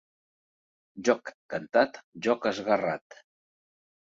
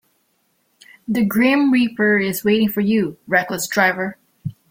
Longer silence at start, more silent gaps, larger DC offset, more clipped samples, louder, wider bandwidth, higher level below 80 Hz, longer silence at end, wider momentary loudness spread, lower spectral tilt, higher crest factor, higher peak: second, 0.95 s vs 1.1 s; first, 1.34-1.49 s, 2.04-2.12 s vs none; neither; neither; second, -29 LUFS vs -18 LUFS; second, 7.8 kHz vs 16.5 kHz; second, -74 dBFS vs -58 dBFS; first, 1.2 s vs 0.2 s; second, 10 LU vs 15 LU; about the same, -4.5 dB/octave vs -5 dB/octave; first, 22 dB vs 16 dB; second, -8 dBFS vs -2 dBFS